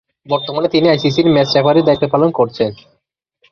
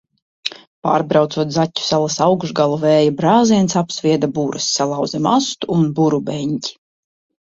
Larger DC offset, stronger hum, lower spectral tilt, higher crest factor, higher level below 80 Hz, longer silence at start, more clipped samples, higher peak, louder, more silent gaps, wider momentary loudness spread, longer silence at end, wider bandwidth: neither; neither; first, -7 dB/octave vs -5 dB/octave; about the same, 14 dB vs 16 dB; first, -50 dBFS vs -56 dBFS; second, 0.3 s vs 0.45 s; neither; about the same, 0 dBFS vs -2 dBFS; first, -14 LUFS vs -17 LUFS; second, none vs 0.67-0.82 s; about the same, 8 LU vs 10 LU; about the same, 0.75 s vs 0.75 s; second, 6.8 kHz vs 8 kHz